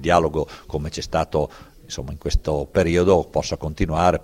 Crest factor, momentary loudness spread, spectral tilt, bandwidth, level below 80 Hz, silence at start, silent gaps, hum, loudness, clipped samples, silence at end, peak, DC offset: 20 dB; 12 LU; -6 dB/octave; 16 kHz; -32 dBFS; 0 s; none; none; -22 LUFS; under 0.1%; 0 s; -2 dBFS; under 0.1%